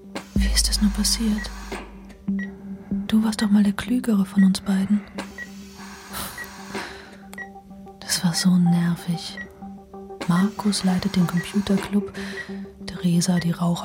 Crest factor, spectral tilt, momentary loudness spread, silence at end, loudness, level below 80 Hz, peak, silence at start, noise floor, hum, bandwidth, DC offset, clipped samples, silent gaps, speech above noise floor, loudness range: 18 dB; -5 dB/octave; 19 LU; 0 s; -23 LUFS; -36 dBFS; -6 dBFS; 0 s; -42 dBFS; none; 16.5 kHz; under 0.1%; under 0.1%; none; 21 dB; 5 LU